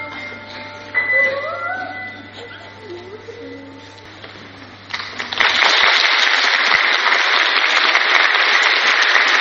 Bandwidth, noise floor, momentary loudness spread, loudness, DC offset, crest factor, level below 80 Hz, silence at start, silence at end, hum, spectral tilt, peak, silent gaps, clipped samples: 7.4 kHz; -38 dBFS; 22 LU; -13 LUFS; under 0.1%; 18 dB; -60 dBFS; 0 s; 0 s; none; 2.5 dB/octave; 0 dBFS; none; under 0.1%